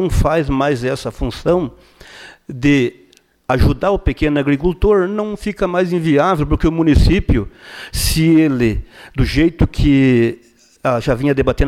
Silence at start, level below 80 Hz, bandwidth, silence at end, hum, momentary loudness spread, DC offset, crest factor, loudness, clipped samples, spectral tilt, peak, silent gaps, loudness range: 0 s; -24 dBFS; 16 kHz; 0 s; none; 11 LU; under 0.1%; 12 dB; -16 LUFS; under 0.1%; -6.5 dB/octave; -4 dBFS; none; 3 LU